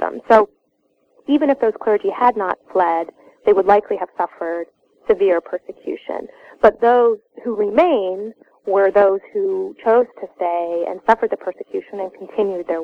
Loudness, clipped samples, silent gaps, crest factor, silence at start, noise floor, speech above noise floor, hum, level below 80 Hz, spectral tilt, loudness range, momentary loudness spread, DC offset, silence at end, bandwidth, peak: -18 LUFS; under 0.1%; none; 18 dB; 0 s; -65 dBFS; 47 dB; none; -56 dBFS; -6.5 dB/octave; 3 LU; 15 LU; under 0.1%; 0 s; 6.6 kHz; 0 dBFS